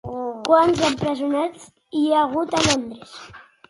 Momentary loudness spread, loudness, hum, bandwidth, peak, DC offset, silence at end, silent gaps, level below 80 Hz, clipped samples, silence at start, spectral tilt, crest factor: 18 LU; -20 LUFS; none; 11.5 kHz; -2 dBFS; under 0.1%; 0.3 s; none; -50 dBFS; under 0.1%; 0.05 s; -4 dB/octave; 18 dB